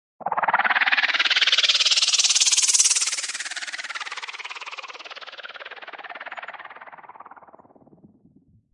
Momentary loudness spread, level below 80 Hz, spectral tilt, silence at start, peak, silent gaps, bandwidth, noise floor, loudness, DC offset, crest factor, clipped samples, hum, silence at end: 21 LU; -82 dBFS; 3.5 dB/octave; 0.2 s; -2 dBFS; none; 12 kHz; -57 dBFS; -19 LUFS; under 0.1%; 24 dB; under 0.1%; none; 1.35 s